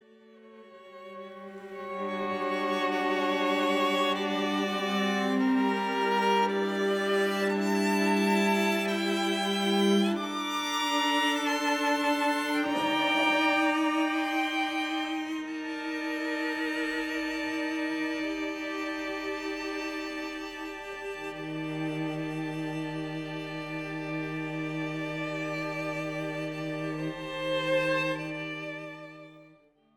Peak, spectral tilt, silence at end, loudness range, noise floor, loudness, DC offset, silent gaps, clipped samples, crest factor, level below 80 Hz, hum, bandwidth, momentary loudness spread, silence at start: -14 dBFS; -4.5 dB/octave; 0.5 s; 8 LU; -60 dBFS; -29 LUFS; under 0.1%; none; under 0.1%; 16 dB; -64 dBFS; none; 18 kHz; 11 LU; 0.3 s